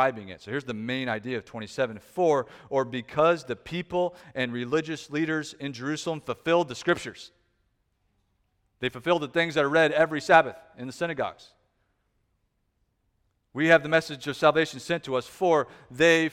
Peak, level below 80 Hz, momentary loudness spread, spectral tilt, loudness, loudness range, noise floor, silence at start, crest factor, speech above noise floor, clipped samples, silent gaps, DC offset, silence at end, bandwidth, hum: -4 dBFS; -64 dBFS; 13 LU; -5 dB/octave; -26 LUFS; 5 LU; -74 dBFS; 0 s; 22 dB; 48 dB; under 0.1%; none; under 0.1%; 0 s; 14.5 kHz; none